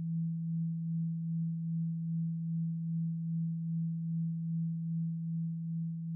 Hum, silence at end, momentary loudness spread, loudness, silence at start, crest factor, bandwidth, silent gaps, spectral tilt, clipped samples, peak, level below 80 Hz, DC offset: none; 0 s; 1 LU; -36 LUFS; 0 s; 6 dB; 0.3 kHz; none; -29 dB/octave; under 0.1%; -30 dBFS; -78 dBFS; under 0.1%